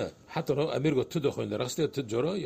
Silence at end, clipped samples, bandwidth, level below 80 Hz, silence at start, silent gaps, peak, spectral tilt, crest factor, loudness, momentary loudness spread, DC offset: 0 s; under 0.1%; 15.5 kHz; -62 dBFS; 0 s; none; -14 dBFS; -6 dB/octave; 16 dB; -30 LUFS; 5 LU; under 0.1%